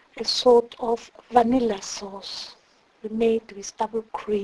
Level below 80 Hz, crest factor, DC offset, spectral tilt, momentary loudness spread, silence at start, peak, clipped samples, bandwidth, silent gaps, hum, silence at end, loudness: -56 dBFS; 20 dB; under 0.1%; -3.5 dB/octave; 16 LU; 0.15 s; -4 dBFS; under 0.1%; 11 kHz; none; none; 0 s; -24 LUFS